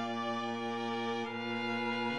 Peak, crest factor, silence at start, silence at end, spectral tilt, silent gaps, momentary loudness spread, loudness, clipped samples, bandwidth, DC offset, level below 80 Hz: -22 dBFS; 14 dB; 0 s; 0 s; -5 dB/octave; none; 3 LU; -36 LUFS; under 0.1%; 10.5 kHz; under 0.1%; -76 dBFS